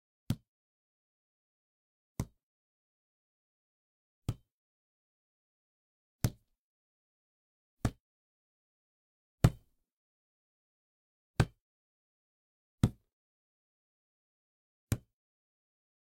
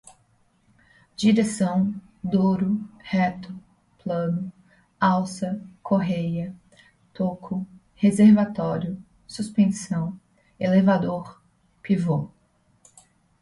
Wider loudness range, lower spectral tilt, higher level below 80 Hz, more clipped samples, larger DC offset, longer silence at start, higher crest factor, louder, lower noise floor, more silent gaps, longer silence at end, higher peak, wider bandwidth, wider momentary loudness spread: first, 14 LU vs 4 LU; about the same, -6.5 dB/octave vs -7 dB/octave; first, -52 dBFS vs -60 dBFS; neither; neither; second, 0.3 s vs 1.2 s; first, 34 dB vs 18 dB; second, -37 LUFS vs -24 LUFS; second, -50 dBFS vs -63 dBFS; first, 0.48-2.15 s, 2.43-4.22 s, 4.52-6.19 s, 6.58-7.77 s, 8.00-9.38 s, 9.92-11.34 s, 11.61-12.78 s, 13.13-14.87 s vs none; about the same, 1.15 s vs 1.15 s; about the same, -8 dBFS vs -6 dBFS; first, 16 kHz vs 11.5 kHz; second, 14 LU vs 19 LU